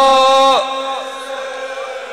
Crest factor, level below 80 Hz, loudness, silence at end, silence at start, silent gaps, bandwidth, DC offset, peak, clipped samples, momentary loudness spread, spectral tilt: 12 dB; -54 dBFS; -15 LUFS; 0 s; 0 s; none; 14 kHz; under 0.1%; -4 dBFS; under 0.1%; 15 LU; -1 dB/octave